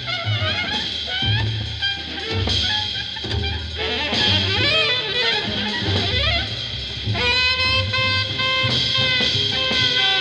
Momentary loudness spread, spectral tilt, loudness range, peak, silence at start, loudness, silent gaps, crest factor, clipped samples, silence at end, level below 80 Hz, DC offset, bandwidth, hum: 8 LU; -3.5 dB/octave; 4 LU; -4 dBFS; 0 s; -19 LUFS; none; 16 dB; under 0.1%; 0 s; -36 dBFS; under 0.1%; 10.5 kHz; none